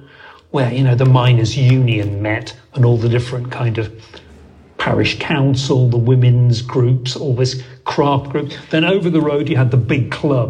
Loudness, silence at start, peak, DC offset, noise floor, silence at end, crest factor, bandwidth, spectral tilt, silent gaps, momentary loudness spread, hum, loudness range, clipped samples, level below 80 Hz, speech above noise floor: -15 LUFS; 0.25 s; 0 dBFS; under 0.1%; -42 dBFS; 0 s; 14 dB; 8.2 kHz; -7 dB/octave; none; 10 LU; none; 3 LU; under 0.1%; -46 dBFS; 28 dB